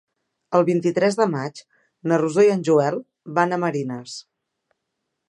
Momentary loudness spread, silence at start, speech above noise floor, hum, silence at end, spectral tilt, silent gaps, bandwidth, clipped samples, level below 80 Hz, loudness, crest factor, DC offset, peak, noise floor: 15 LU; 0.5 s; 58 dB; none; 1.1 s; -6.5 dB/octave; none; 11 kHz; under 0.1%; -74 dBFS; -21 LUFS; 20 dB; under 0.1%; -2 dBFS; -79 dBFS